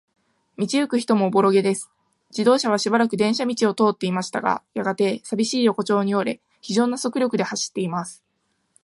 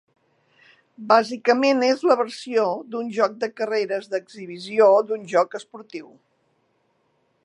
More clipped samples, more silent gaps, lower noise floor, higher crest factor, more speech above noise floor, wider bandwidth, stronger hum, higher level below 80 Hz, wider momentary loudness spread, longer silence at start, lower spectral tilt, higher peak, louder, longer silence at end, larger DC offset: neither; neither; about the same, -71 dBFS vs -68 dBFS; about the same, 18 dB vs 22 dB; first, 50 dB vs 46 dB; about the same, 11.5 kHz vs 11 kHz; neither; first, -70 dBFS vs -82 dBFS; second, 9 LU vs 20 LU; second, 0.6 s vs 1 s; about the same, -5 dB/octave vs -4.5 dB/octave; about the same, -4 dBFS vs -2 dBFS; about the same, -22 LUFS vs -21 LUFS; second, 0.7 s vs 1.45 s; neither